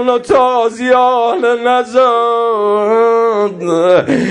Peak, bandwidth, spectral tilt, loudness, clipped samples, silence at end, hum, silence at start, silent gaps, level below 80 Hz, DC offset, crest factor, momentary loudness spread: 0 dBFS; 11 kHz; -5.5 dB/octave; -11 LUFS; under 0.1%; 0 s; none; 0 s; none; -52 dBFS; under 0.1%; 10 dB; 3 LU